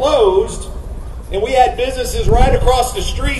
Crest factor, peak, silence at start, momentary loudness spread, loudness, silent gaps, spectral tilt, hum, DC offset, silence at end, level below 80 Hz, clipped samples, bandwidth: 14 dB; 0 dBFS; 0 s; 16 LU; -15 LUFS; none; -5 dB/octave; none; under 0.1%; 0 s; -20 dBFS; under 0.1%; 12.5 kHz